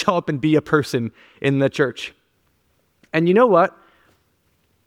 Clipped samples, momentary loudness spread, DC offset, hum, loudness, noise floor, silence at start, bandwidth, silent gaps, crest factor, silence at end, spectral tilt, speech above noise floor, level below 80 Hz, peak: under 0.1%; 12 LU; under 0.1%; none; -19 LUFS; -65 dBFS; 0 s; 16 kHz; none; 18 dB; 1.15 s; -6.5 dB/octave; 47 dB; -60 dBFS; -2 dBFS